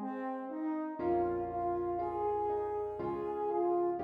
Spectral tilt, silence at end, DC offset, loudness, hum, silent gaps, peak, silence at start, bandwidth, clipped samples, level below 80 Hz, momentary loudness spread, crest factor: -10 dB/octave; 0 s; under 0.1%; -35 LUFS; none; none; -22 dBFS; 0 s; 4.1 kHz; under 0.1%; -62 dBFS; 6 LU; 12 dB